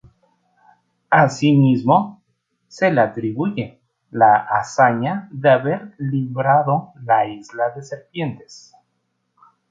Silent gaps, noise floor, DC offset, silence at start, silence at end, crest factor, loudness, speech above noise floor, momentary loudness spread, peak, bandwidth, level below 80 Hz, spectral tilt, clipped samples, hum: none; -71 dBFS; under 0.1%; 1.1 s; 1.15 s; 18 dB; -18 LUFS; 53 dB; 13 LU; -2 dBFS; 7.8 kHz; -62 dBFS; -7 dB/octave; under 0.1%; none